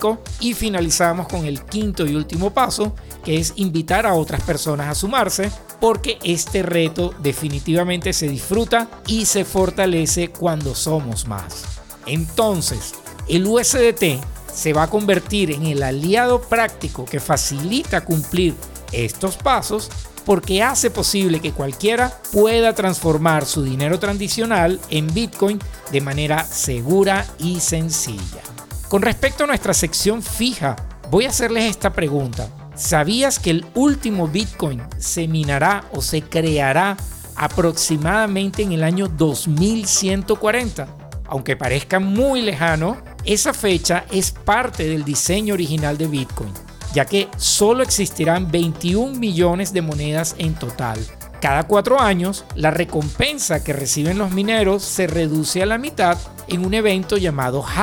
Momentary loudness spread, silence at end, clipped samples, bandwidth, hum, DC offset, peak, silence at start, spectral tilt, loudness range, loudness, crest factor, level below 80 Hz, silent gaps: 8 LU; 0 s; under 0.1%; 20 kHz; none; under 0.1%; -2 dBFS; 0 s; -4 dB/octave; 2 LU; -19 LUFS; 16 dB; -36 dBFS; none